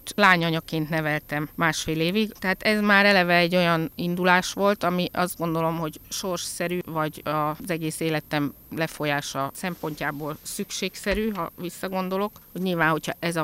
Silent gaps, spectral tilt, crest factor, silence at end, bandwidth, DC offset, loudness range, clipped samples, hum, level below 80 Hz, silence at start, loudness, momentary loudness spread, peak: none; -4.5 dB/octave; 22 dB; 0 s; 16 kHz; under 0.1%; 8 LU; under 0.1%; none; -52 dBFS; 0.05 s; -24 LUFS; 12 LU; -4 dBFS